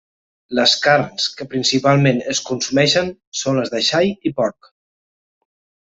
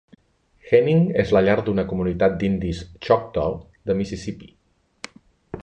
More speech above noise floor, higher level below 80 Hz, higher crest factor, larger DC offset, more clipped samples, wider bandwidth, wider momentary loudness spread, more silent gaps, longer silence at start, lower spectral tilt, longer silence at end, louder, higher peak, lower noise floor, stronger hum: first, over 73 dB vs 39 dB; second, -58 dBFS vs -42 dBFS; about the same, 18 dB vs 18 dB; neither; neither; second, 8 kHz vs 9 kHz; second, 8 LU vs 21 LU; first, 3.27-3.32 s vs none; second, 0.5 s vs 0.65 s; second, -4 dB/octave vs -7.5 dB/octave; first, 1.4 s vs 0.05 s; first, -17 LUFS vs -21 LUFS; first, 0 dBFS vs -4 dBFS; first, under -90 dBFS vs -60 dBFS; neither